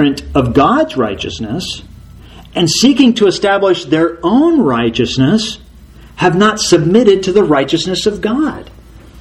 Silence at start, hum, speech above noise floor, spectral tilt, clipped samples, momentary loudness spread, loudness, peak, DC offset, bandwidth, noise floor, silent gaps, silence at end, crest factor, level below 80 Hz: 0 s; none; 26 dB; -5 dB/octave; 0.2%; 11 LU; -12 LUFS; 0 dBFS; under 0.1%; 13 kHz; -37 dBFS; none; 0 s; 12 dB; -36 dBFS